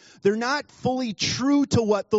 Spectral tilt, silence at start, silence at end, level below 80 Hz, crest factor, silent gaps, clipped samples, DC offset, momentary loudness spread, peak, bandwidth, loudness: -4.5 dB/octave; 0.25 s; 0 s; -58 dBFS; 16 dB; none; under 0.1%; under 0.1%; 6 LU; -8 dBFS; 8 kHz; -24 LUFS